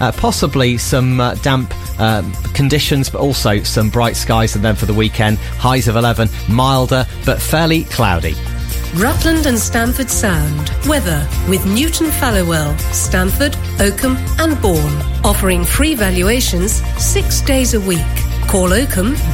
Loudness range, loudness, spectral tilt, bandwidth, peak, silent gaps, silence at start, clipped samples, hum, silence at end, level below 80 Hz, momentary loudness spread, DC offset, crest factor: 1 LU; -14 LUFS; -4.5 dB/octave; 16.5 kHz; 0 dBFS; none; 0 s; under 0.1%; none; 0 s; -20 dBFS; 4 LU; under 0.1%; 14 dB